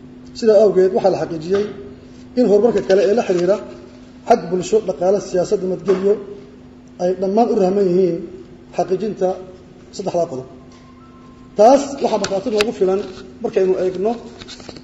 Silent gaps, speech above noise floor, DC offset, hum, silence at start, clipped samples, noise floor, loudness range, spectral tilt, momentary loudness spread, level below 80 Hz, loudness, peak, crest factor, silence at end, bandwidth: none; 25 dB; under 0.1%; none; 0.05 s; under 0.1%; -42 dBFS; 4 LU; -6 dB/octave; 21 LU; -50 dBFS; -17 LUFS; -2 dBFS; 16 dB; 0.05 s; 9.8 kHz